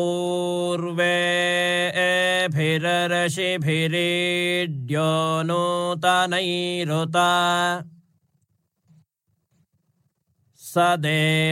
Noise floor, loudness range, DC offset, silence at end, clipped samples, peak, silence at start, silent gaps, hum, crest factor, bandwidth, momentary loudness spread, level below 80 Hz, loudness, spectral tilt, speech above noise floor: -72 dBFS; 7 LU; under 0.1%; 0 s; under 0.1%; -6 dBFS; 0 s; none; none; 16 dB; 16.5 kHz; 5 LU; -70 dBFS; -21 LUFS; -4.5 dB/octave; 50 dB